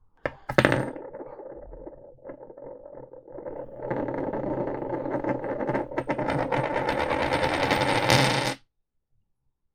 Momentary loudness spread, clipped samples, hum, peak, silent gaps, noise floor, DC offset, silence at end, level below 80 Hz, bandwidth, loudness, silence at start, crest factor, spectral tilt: 22 LU; under 0.1%; none; 0 dBFS; none; -73 dBFS; under 0.1%; 1.2 s; -50 dBFS; 16.5 kHz; -26 LUFS; 0.25 s; 28 dB; -5 dB/octave